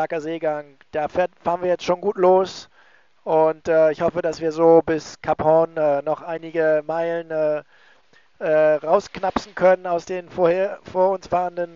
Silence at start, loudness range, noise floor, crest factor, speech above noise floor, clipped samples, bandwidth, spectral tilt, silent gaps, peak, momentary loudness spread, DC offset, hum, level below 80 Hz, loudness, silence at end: 0 s; 3 LU; -57 dBFS; 18 dB; 37 dB; under 0.1%; 7.6 kHz; -5 dB/octave; none; -2 dBFS; 10 LU; 0.1%; none; -56 dBFS; -21 LUFS; 0.1 s